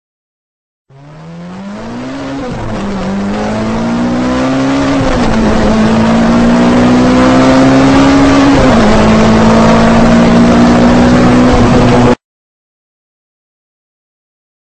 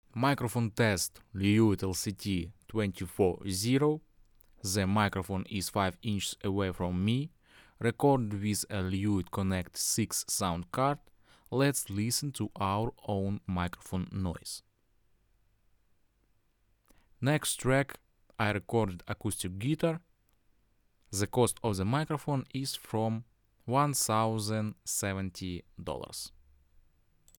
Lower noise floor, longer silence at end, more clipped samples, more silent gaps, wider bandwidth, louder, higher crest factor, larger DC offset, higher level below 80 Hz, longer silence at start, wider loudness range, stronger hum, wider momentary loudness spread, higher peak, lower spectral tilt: second, -30 dBFS vs -71 dBFS; first, 2.65 s vs 1.1 s; neither; neither; second, 9 kHz vs over 20 kHz; first, -8 LUFS vs -32 LUFS; second, 8 dB vs 20 dB; neither; first, -22 dBFS vs -56 dBFS; first, 1.05 s vs 0.15 s; first, 10 LU vs 5 LU; neither; first, 13 LU vs 10 LU; first, 0 dBFS vs -12 dBFS; first, -6.5 dB/octave vs -5 dB/octave